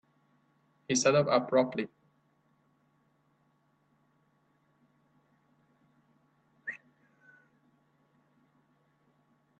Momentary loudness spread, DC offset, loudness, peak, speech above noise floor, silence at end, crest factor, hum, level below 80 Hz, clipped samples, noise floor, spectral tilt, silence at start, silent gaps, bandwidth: 18 LU; under 0.1%; -28 LUFS; -12 dBFS; 45 dB; 2.85 s; 24 dB; none; -78 dBFS; under 0.1%; -72 dBFS; -4 dB/octave; 0.9 s; none; 8.2 kHz